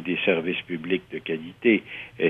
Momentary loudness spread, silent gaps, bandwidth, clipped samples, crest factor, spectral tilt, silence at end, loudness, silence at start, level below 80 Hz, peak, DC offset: 9 LU; none; 4.2 kHz; under 0.1%; 20 dB; -7.5 dB/octave; 0 s; -25 LUFS; 0 s; -66 dBFS; -6 dBFS; under 0.1%